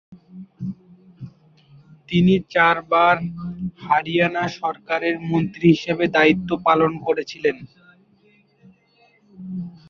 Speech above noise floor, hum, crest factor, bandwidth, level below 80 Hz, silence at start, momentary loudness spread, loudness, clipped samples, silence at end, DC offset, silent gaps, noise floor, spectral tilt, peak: 39 dB; none; 18 dB; 7 kHz; -56 dBFS; 0.1 s; 17 LU; -19 LUFS; under 0.1%; 0.2 s; under 0.1%; none; -58 dBFS; -7 dB/octave; -2 dBFS